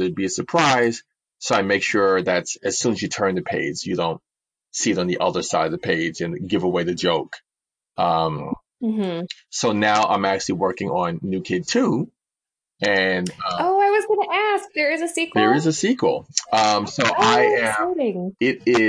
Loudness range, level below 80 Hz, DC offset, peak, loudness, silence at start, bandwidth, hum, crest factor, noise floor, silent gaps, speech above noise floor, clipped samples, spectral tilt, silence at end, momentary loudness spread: 4 LU; -60 dBFS; under 0.1%; -2 dBFS; -21 LUFS; 0 s; 10.5 kHz; none; 18 dB; -89 dBFS; none; 68 dB; under 0.1%; -4 dB/octave; 0 s; 8 LU